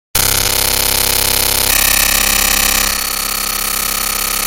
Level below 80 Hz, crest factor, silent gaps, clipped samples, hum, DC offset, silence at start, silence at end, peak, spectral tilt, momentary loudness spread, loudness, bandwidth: -28 dBFS; 14 dB; none; under 0.1%; none; under 0.1%; 0.15 s; 0 s; 0 dBFS; -0.5 dB/octave; 6 LU; -11 LUFS; over 20 kHz